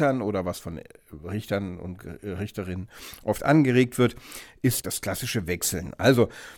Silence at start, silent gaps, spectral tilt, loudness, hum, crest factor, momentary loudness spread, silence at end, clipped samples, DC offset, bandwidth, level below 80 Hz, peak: 0 s; none; -5 dB/octave; -26 LUFS; none; 20 dB; 18 LU; 0 s; under 0.1%; under 0.1%; 19 kHz; -52 dBFS; -6 dBFS